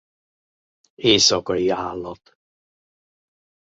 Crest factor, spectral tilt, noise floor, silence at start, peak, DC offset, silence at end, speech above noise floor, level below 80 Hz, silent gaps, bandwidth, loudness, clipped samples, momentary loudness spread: 22 dB; -2.5 dB/octave; under -90 dBFS; 1 s; -2 dBFS; under 0.1%; 1.55 s; over 70 dB; -54 dBFS; none; 8 kHz; -18 LUFS; under 0.1%; 17 LU